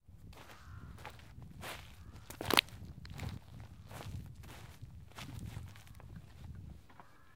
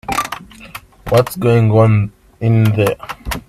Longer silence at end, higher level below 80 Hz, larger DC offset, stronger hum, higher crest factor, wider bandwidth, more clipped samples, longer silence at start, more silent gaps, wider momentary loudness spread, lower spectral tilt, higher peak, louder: about the same, 0 s vs 0.1 s; second, -58 dBFS vs -38 dBFS; neither; neither; first, 40 dB vs 14 dB; first, 17 kHz vs 14.5 kHz; neither; about the same, 0 s vs 0.1 s; neither; second, 17 LU vs 20 LU; second, -3.5 dB/octave vs -7 dB/octave; second, -4 dBFS vs 0 dBFS; second, -40 LUFS vs -15 LUFS